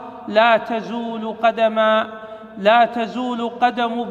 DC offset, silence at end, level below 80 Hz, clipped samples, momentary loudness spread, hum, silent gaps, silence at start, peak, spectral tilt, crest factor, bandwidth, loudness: under 0.1%; 0 s; -64 dBFS; under 0.1%; 11 LU; none; none; 0 s; -2 dBFS; -5.5 dB/octave; 18 dB; 7.4 kHz; -18 LUFS